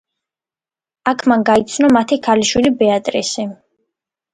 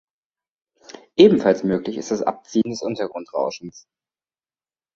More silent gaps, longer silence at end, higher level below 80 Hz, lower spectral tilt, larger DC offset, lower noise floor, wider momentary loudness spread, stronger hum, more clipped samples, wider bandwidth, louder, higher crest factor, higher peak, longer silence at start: neither; second, 0.8 s vs 1.15 s; first, -50 dBFS vs -60 dBFS; second, -4 dB/octave vs -6 dB/octave; neither; about the same, under -90 dBFS vs under -90 dBFS; second, 9 LU vs 14 LU; neither; neither; first, 11 kHz vs 7.6 kHz; first, -15 LUFS vs -20 LUFS; second, 16 dB vs 22 dB; about the same, 0 dBFS vs 0 dBFS; about the same, 1.05 s vs 1.15 s